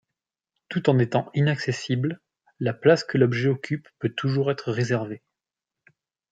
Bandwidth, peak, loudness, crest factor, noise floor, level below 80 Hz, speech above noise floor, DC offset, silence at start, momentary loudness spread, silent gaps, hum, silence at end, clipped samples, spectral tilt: 7.8 kHz; -4 dBFS; -24 LUFS; 20 dB; -88 dBFS; -66 dBFS; 65 dB; under 0.1%; 0.7 s; 11 LU; none; none; 1.15 s; under 0.1%; -7 dB/octave